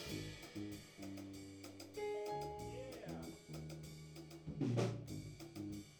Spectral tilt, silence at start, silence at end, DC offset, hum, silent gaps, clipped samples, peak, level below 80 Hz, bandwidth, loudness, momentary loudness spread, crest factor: -6 dB/octave; 0 s; 0 s; under 0.1%; none; none; under 0.1%; -26 dBFS; -66 dBFS; over 20 kHz; -47 LUFS; 12 LU; 20 dB